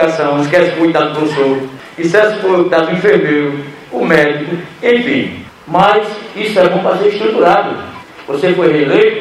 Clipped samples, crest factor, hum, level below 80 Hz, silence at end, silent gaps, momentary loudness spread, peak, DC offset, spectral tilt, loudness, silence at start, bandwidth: 0.1%; 12 dB; none; -52 dBFS; 0 s; none; 12 LU; 0 dBFS; under 0.1%; -6 dB/octave; -12 LUFS; 0 s; 12.5 kHz